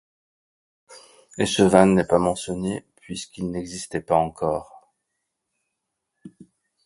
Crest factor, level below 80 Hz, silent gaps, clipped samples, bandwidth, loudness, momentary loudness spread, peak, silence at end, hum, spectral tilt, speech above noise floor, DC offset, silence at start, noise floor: 24 dB; -52 dBFS; none; under 0.1%; 11.5 kHz; -22 LUFS; 18 LU; 0 dBFS; 0.55 s; none; -5.5 dB/octave; 59 dB; under 0.1%; 0.9 s; -80 dBFS